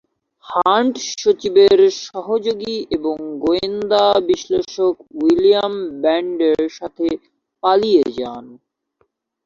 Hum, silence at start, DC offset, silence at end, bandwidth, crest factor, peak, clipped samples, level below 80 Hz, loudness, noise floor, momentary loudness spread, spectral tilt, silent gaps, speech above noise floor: none; 0.45 s; under 0.1%; 0.9 s; 7.2 kHz; 16 dB; -2 dBFS; under 0.1%; -54 dBFS; -17 LUFS; -65 dBFS; 10 LU; -4 dB/octave; none; 49 dB